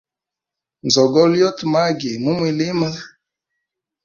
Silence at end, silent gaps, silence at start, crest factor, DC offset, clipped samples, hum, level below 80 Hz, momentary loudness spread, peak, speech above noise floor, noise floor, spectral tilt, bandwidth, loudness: 0.95 s; none; 0.85 s; 18 dB; under 0.1%; under 0.1%; none; -60 dBFS; 10 LU; -2 dBFS; 70 dB; -86 dBFS; -5 dB/octave; 7.4 kHz; -17 LUFS